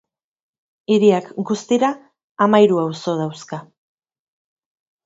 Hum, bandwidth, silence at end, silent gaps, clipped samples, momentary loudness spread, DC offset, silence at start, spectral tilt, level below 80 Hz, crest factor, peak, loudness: none; 7.8 kHz; 1.45 s; 2.24-2.35 s; under 0.1%; 19 LU; under 0.1%; 0.9 s; -6 dB/octave; -68 dBFS; 20 dB; 0 dBFS; -18 LUFS